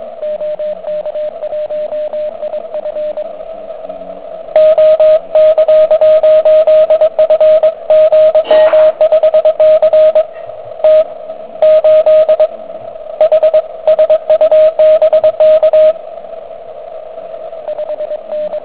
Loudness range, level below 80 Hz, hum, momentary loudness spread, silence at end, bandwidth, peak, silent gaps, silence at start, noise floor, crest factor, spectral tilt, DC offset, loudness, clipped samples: 11 LU; -54 dBFS; none; 19 LU; 0 s; 4 kHz; 0 dBFS; none; 0 s; -28 dBFS; 10 dB; -6.5 dB/octave; 1%; -9 LUFS; under 0.1%